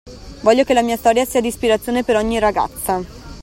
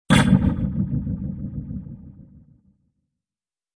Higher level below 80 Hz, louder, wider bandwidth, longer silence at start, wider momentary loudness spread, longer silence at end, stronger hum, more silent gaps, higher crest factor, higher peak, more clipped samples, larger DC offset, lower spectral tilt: about the same, -40 dBFS vs -36 dBFS; first, -17 LUFS vs -22 LUFS; first, 16.5 kHz vs 11 kHz; about the same, 0.05 s vs 0.1 s; second, 7 LU vs 19 LU; second, 0 s vs 1.55 s; neither; neither; about the same, 16 dB vs 20 dB; about the same, 0 dBFS vs -2 dBFS; neither; neither; second, -4 dB/octave vs -6 dB/octave